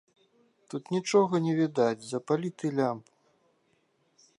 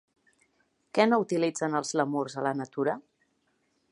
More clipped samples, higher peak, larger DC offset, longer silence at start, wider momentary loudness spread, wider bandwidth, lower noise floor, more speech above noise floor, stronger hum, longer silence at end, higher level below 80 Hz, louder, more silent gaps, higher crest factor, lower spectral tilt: neither; about the same, -10 dBFS vs -10 dBFS; neither; second, 0.7 s vs 0.95 s; first, 13 LU vs 7 LU; about the same, 11.5 kHz vs 11 kHz; about the same, -71 dBFS vs -73 dBFS; about the same, 43 dB vs 46 dB; neither; first, 1.4 s vs 0.9 s; about the same, -80 dBFS vs -82 dBFS; about the same, -28 LUFS vs -28 LUFS; neither; about the same, 20 dB vs 22 dB; about the same, -6 dB/octave vs -5 dB/octave